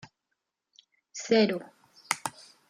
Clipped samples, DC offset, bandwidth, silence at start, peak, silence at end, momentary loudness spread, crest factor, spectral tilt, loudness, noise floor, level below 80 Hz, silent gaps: under 0.1%; under 0.1%; 15.5 kHz; 1.15 s; -8 dBFS; 0.4 s; 16 LU; 24 dB; -4 dB/octave; -28 LUFS; -83 dBFS; -78 dBFS; none